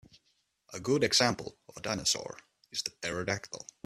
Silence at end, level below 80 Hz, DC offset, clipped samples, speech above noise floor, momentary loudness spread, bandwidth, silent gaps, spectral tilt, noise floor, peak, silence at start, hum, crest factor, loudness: 0.25 s; -64 dBFS; under 0.1%; under 0.1%; 43 dB; 20 LU; 15.5 kHz; none; -2.5 dB/octave; -75 dBFS; -12 dBFS; 0.7 s; none; 22 dB; -31 LUFS